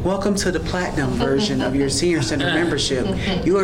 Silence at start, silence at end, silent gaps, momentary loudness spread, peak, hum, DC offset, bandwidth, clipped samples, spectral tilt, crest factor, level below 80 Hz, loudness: 0 s; 0 s; none; 3 LU; -10 dBFS; none; under 0.1%; 17 kHz; under 0.1%; -4.5 dB/octave; 10 dB; -34 dBFS; -20 LUFS